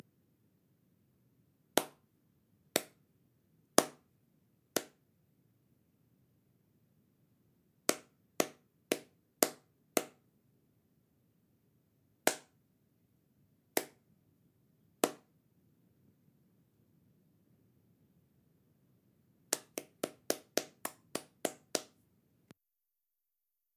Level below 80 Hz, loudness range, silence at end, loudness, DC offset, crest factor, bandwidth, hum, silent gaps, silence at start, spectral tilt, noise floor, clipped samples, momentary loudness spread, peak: -88 dBFS; 7 LU; 1.9 s; -37 LUFS; under 0.1%; 42 dB; 16 kHz; none; none; 1.75 s; -1.5 dB/octave; -88 dBFS; under 0.1%; 12 LU; -2 dBFS